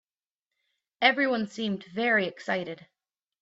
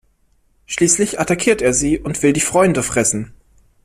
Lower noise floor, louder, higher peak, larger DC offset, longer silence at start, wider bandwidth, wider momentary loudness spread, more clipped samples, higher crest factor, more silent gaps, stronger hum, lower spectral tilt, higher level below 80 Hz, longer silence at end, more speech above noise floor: first, under -90 dBFS vs -58 dBFS; second, -27 LUFS vs -16 LUFS; second, -8 dBFS vs -2 dBFS; neither; first, 1 s vs 0.7 s; second, 8 kHz vs 15.5 kHz; first, 10 LU vs 6 LU; neither; first, 22 dB vs 16 dB; neither; neither; about the same, -5 dB/octave vs -4 dB/octave; second, -74 dBFS vs -42 dBFS; about the same, 0.65 s vs 0.55 s; first, over 63 dB vs 42 dB